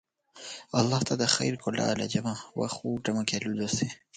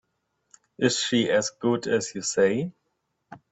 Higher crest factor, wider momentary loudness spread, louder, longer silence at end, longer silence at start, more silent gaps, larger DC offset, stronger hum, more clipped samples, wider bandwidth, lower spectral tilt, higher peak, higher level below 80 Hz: about the same, 24 dB vs 20 dB; first, 9 LU vs 5 LU; second, -29 LUFS vs -24 LUFS; about the same, 0.2 s vs 0.15 s; second, 0.35 s vs 0.8 s; neither; neither; neither; neither; first, 9.6 kHz vs 8.4 kHz; about the same, -4 dB/octave vs -3.5 dB/octave; about the same, -6 dBFS vs -8 dBFS; about the same, -62 dBFS vs -66 dBFS